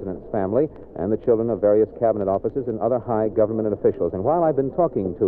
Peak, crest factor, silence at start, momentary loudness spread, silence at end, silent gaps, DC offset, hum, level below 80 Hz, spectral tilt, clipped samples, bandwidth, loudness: -8 dBFS; 14 dB; 0 s; 7 LU; 0 s; none; under 0.1%; none; -48 dBFS; -13 dB/octave; under 0.1%; 2.8 kHz; -22 LUFS